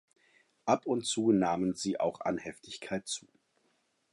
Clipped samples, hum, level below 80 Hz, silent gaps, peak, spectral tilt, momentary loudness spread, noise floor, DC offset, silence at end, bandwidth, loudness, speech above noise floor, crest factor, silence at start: under 0.1%; none; -68 dBFS; none; -12 dBFS; -4.5 dB/octave; 12 LU; -75 dBFS; under 0.1%; 0.95 s; 11.5 kHz; -32 LUFS; 43 dB; 22 dB; 0.65 s